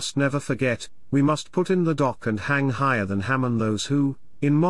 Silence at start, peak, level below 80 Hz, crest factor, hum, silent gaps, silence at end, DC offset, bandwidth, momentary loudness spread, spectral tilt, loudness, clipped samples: 0 s; -10 dBFS; -58 dBFS; 14 dB; none; none; 0 s; 0.8%; 12 kHz; 4 LU; -6 dB/octave; -24 LUFS; under 0.1%